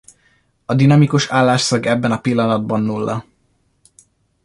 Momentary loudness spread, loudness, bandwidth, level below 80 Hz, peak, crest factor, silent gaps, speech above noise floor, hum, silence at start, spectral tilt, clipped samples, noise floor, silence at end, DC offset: 10 LU; -16 LUFS; 11.5 kHz; -54 dBFS; -2 dBFS; 16 dB; none; 47 dB; none; 0.7 s; -6 dB/octave; under 0.1%; -62 dBFS; 1.25 s; under 0.1%